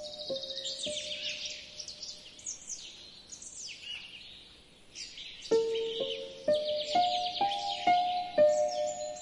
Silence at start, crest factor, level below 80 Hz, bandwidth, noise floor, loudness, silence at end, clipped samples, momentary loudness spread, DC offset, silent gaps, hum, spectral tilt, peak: 0 s; 18 dB; -68 dBFS; 11.5 kHz; -56 dBFS; -32 LUFS; 0 s; under 0.1%; 17 LU; under 0.1%; none; none; -1.5 dB/octave; -16 dBFS